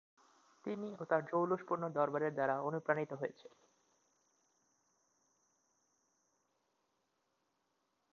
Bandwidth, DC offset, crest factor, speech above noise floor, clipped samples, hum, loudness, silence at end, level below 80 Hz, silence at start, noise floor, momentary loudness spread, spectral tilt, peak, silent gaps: 7.2 kHz; under 0.1%; 26 dB; 45 dB; under 0.1%; none; -38 LUFS; 4.85 s; -88 dBFS; 0.65 s; -82 dBFS; 9 LU; -6.5 dB/octave; -16 dBFS; none